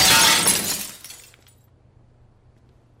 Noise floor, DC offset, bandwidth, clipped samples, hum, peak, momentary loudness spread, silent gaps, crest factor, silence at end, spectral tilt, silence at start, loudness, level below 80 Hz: -54 dBFS; under 0.1%; 16.5 kHz; under 0.1%; none; -6 dBFS; 26 LU; none; 18 dB; 1.85 s; 0 dB/octave; 0 s; -16 LUFS; -52 dBFS